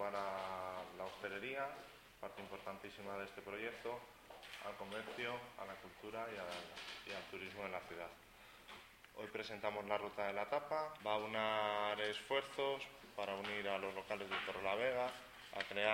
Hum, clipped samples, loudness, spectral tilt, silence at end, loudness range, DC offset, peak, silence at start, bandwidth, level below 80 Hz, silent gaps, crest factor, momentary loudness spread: none; under 0.1%; -44 LUFS; -3.5 dB/octave; 0 s; 8 LU; under 0.1%; -20 dBFS; 0 s; 16.5 kHz; -74 dBFS; none; 24 dB; 14 LU